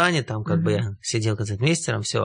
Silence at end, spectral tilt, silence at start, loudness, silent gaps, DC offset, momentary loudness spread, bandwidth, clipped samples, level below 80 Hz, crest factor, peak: 0 s; -5 dB/octave; 0 s; -24 LUFS; none; under 0.1%; 4 LU; 10.5 kHz; under 0.1%; -58 dBFS; 18 dB; -4 dBFS